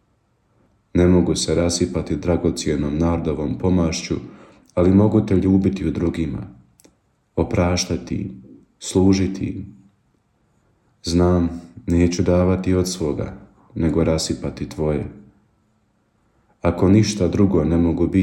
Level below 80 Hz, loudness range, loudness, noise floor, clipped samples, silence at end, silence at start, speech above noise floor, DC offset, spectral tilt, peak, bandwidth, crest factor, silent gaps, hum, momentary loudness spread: -38 dBFS; 5 LU; -20 LUFS; -64 dBFS; under 0.1%; 0 s; 0.95 s; 45 dB; under 0.1%; -6.5 dB/octave; -4 dBFS; 12.5 kHz; 16 dB; none; none; 13 LU